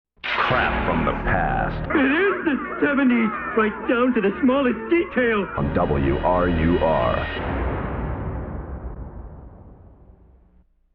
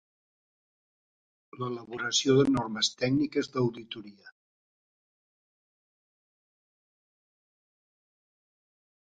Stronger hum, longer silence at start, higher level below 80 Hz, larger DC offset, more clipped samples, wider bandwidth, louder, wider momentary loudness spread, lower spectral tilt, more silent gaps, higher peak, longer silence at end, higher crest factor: neither; second, 0.25 s vs 1.55 s; first, -34 dBFS vs -66 dBFS; neither; neither; second, 5.6 kHz vs 9.6 kHz; first, -21 LUFS vs -28 LUFS; second, 12 LU vs 16 LU; first, -9.5 dB/octave vs -4.5 dB/octave; neither; first, -8 dBFS vs -12 dBFS; second, 1.2 s vs 4.7 s; second, 14 dB vs 22 dB